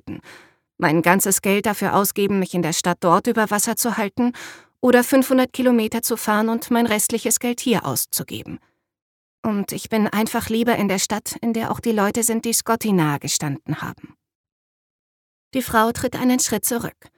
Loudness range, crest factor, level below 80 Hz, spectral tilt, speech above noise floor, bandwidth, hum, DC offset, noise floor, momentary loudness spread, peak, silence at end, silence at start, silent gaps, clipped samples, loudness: 5 LU; 20 dB; -56 dBFS; -4 dB/octave; 28 dB; 19 kHz; none; under 0.1%; -48 dBFS; 10 LU; -2 dBFS; 0.25 s; 0.05 s; 9.02-9.43 s, 14.35-14.44 s, 14.52-15.51 s; under 0.1%; -20 LUFS